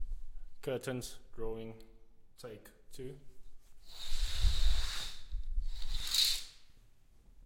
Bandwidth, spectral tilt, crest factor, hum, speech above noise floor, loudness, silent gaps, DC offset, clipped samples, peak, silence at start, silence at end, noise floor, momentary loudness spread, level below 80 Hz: 16.5 kHz; -3 dB/octave; 18 dB; none; 23 dB; -37 LUFS; none; under 0.1%; under 0.1%; -16 dBFS; 0 s; 0.05 s; -60 dBFS; 22 LU; -40 dBFS